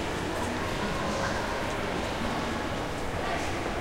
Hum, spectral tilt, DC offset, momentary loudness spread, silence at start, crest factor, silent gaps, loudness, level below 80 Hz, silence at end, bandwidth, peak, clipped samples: none; -4.5 dB/octave; under 0.1%; 2 LU; 0 s; 12 dB; none; -31 LUFS; -42 dBFS; 0 s; 16.5 kHz; -18 dBFS; under 0.1%